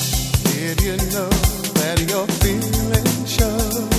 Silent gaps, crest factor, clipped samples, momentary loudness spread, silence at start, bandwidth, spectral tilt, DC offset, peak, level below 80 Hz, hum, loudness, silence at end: none; 16 dB; under 0.1%; 2 LU; 0 s; 16 kHz; -4.5 dB/octave; under 0.1%; -2 dBFS; -26 dBFS; none; -19 LUFS; 0 s